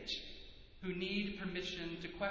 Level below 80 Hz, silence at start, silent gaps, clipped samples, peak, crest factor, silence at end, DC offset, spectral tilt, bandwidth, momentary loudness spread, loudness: -60 dBFS; 0 s; none; under 0.1%; -24 dBFS; 18 dB; 0 s; under 0.1%; -5 dB/octave; 7.6 kHz; 14 LU; -42 LUFS